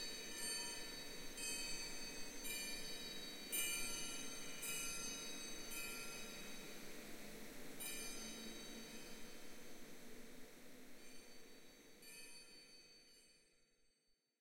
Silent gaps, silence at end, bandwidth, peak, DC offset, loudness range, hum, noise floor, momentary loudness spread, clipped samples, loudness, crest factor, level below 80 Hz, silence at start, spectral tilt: none; 0 s; 16 kHz; -28 dBFS; under 0.1%; 15 LU; none; -82 dBFS; 17 LU; under 0.1%; -48 LUFS; 20 dB; -62 dBFS; 0 s; -1 dB/octave